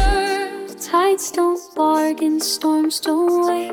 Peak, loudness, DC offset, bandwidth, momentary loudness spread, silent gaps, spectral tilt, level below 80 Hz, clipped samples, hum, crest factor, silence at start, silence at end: -6 dBFS; -19 LUFS; under 0.1%; 19 kHz; 5 LU; none; -4 dB/octave; -30 dBFS; under 0.1%; none; 12 dB; 0 s; 0 s